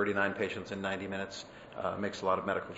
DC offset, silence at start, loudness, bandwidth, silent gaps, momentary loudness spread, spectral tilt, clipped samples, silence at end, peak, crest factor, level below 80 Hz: under 0.1%; 0 s; -35 LUFS; 7.6 kHz; none; 10 LU; -3.5 dB/octave; under 0.1%; 0 s; -14 dBFS; 20 dB; -66 dBFS